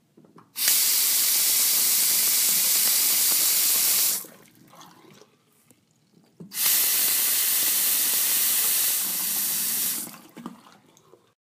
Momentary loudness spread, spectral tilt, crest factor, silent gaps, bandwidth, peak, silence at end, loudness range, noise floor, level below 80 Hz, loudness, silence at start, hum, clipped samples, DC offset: 6 LU; 2 dB/octave; 20 dB; none; 16 kHz; -4 dBFS; 1 s; 7 LU; -61 dBFS; -86 dBFS; -19 LUFS; 0.55 s; none; under 0.1%; under 0.1%